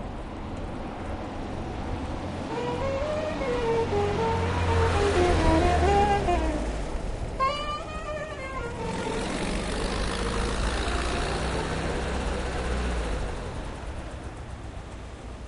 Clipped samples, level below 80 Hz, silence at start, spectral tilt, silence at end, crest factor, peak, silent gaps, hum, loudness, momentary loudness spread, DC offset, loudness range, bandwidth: under 0.1%; -34 dBFS; 0 s; -5.5 dB/octave; 0 s; 18 dB; -10 dBFS; none; none; -28 LUFS; 14 LU; under 0.1%; 8 LU; 11 kHz